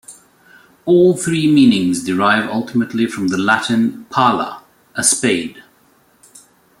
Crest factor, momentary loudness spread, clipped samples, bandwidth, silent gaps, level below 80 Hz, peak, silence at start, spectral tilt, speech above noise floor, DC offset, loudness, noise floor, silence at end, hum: 16 dB; 9 LU; under 0.1%; 16 kHz; none; -58 dBFS; 0 dBFS; 0.1 s; -4 dB/octave; 39 dB; under 0.1%; -15 LUFS; -54 dBFS; 1.2 s; none